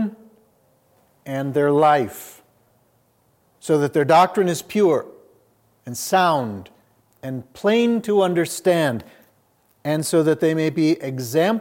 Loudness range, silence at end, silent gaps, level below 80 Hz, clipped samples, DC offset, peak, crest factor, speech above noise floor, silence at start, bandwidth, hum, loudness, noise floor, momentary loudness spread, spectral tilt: 3 LU; 0 s; none; -70 dBFS; under 0.1%; under 0.1%; -4 dBFS; 16 dB; 43 dB; 0 s; 17 kHz; none; -19 LUFS; -62 dBFS; 16 LU; -5.5 dB/octave